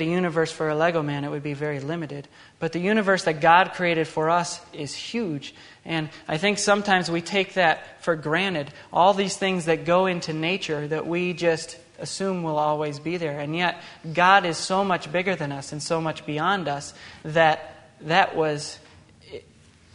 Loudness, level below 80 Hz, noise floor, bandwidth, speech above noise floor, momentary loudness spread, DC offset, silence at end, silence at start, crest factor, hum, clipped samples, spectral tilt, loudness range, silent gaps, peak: -24 LUFS; -64 dBFS; -54 dBFS; 10.5 kHz; 30 dB; 14 LU; under 0.1%; 0.55 s; 0 s; 22 dB; none; under 0.1%; -4.5 dB/octave; 3 LU; none; -2 dBFS